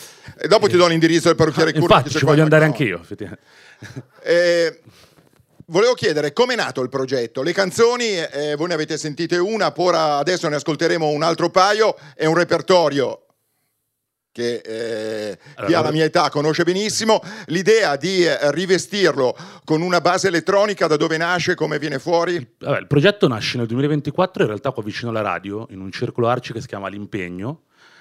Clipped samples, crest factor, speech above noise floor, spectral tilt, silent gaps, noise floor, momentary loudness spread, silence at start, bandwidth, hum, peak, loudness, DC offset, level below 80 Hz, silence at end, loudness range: under 0.1%; 18 dB; 59 dB; -5 dB/octave; none; -77 dBFS; 13 LU; 0 s; 14.5 kHz; none; 0 dBFS; -18 LUFS; under 0.1%; -56 dBFS; 0.45 s; 5 LU